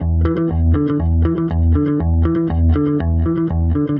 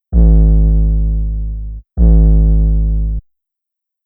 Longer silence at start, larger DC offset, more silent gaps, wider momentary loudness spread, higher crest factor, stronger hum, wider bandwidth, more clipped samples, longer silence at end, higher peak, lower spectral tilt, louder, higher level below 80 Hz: about the same, 0 s vs 0.1 s; neither; neither; second, 2 LU vs 14 LU; about the same, 10 dB vs 10 dB; neither; first, 3.4 kHz vs 0.9 kHz; neither; second, 0 s vs 0.85 s; second, -4 dBFS vs 0 dBFS; second, -12.5 dB/octave vs -18 dB/octave; second, -17 LUFS vs -14 LUFS; second, -22 dBFS vs -12 dBFS